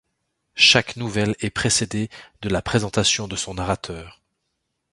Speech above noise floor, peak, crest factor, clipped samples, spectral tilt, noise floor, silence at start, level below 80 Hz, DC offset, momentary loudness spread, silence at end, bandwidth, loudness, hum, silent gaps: 54 dB; 0 dBFS; 22 dB; under 0.1%; -3 dB/octave; -76 dBFS; 0.55 s; -44 dBFS; under 0.1%; 18 LU; 0.8 s; 11.5 kHz; -20 LUFS; none; none